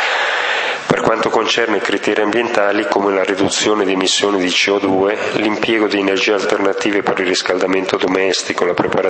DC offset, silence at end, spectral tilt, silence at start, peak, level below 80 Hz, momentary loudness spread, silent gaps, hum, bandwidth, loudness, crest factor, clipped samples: under 0.1%; 0 s; -3 dB/octave; 0 s; 0 dBFS; -56 dBFS; 3 LU; none; none; 8.8 kHz; -15 LUFS; 16 dB; under 0.1%